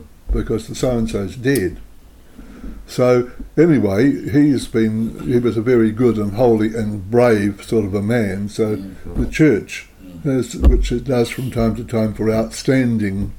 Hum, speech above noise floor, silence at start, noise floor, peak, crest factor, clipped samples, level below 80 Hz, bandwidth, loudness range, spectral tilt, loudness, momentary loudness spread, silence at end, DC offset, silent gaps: none; 25 dB; 0 s; -42 dBFS; -2 dBFS; 16 dB; under 0.1%; -28 dBFS; 18 kHz; 3 LU; -7 dB/octave; -18 LUFS; 10 LU; 0 s; under 0.1%; none